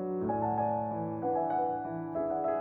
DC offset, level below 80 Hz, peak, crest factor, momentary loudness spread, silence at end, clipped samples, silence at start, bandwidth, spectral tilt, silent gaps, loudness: under 0.1%; -64 dBFS; -20 dBFS; 12 dB; 4 LU; 0 s; under 0.1%; 0 s; 4 kHz; -12 dB/octave; none; -32 LUFS